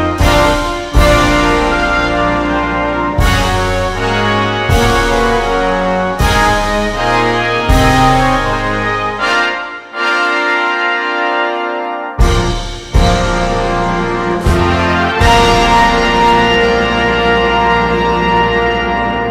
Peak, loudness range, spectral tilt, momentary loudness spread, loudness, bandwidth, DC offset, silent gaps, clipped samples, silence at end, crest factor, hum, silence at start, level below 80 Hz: 0 dBFS; 4 LU; -5 dB/octave; 6 LU; -12 LUFS; 16 kHz; under 0.1%; none; under 0.1%; 0 s; 12 dB; none; 0 s; -20 dBFS